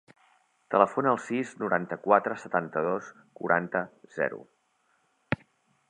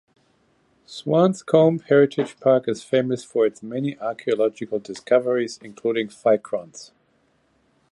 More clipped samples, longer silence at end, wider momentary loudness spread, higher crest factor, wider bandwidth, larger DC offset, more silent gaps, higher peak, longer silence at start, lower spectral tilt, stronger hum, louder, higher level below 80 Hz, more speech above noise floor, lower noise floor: neither; second, 0.55 s vs 1.05 s; about the same, 11 LU vs 13 LU; first, 26 dB vs 20 dB; second, 10 kHz vs 11.5 kHz; neither; neither; about the same, -4 dBFS vs -2 dBFS; second, 0.7 s vs 0.9 s; about the same, -6.5 dB/octave vs -6.5 dB/octave; neither; second, -28 LUFS vs -22 LUFS; about the same, -68 dBFS vs -70 dBFS; about the same, 43 dB vs 43 dB; first, -71 dBFS vs -64 dBFS